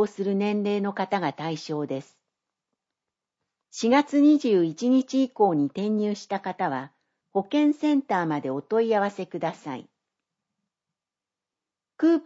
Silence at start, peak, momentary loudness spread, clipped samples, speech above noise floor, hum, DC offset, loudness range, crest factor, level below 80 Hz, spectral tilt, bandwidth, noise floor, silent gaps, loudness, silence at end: 0 s; -8 dBFS; 11 LU; under 0.1%; 66 dB; none; under 0.1%; 8 LU; 18 dB; -80 dBFS; -6.5 dB/octave; 8 kHz; -90 dBFS; none; -25 LUFS; 0.05 s